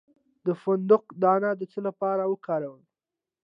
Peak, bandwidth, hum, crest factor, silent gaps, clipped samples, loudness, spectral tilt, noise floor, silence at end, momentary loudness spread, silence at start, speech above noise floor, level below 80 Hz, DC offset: -8 dBFS; 5.2 kHz; none; 20 dB; none; under 0.1%; -26 LUFS; -10 dB/octave; -90 dBFS; 0.7 s; 10 LU; 0.45 s; 64 dB; -84 dBFS; under 0.1%